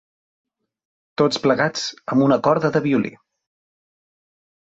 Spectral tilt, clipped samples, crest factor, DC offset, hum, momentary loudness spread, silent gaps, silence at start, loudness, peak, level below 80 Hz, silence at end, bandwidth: -5.5 dB/octave; under 0.1%; 18 dB; under 0.1%; none; 9 LU; none; 1.2 s; -19 LUFS; -4 dBFS; -62 dBFS; 1.6 s; 8 kHz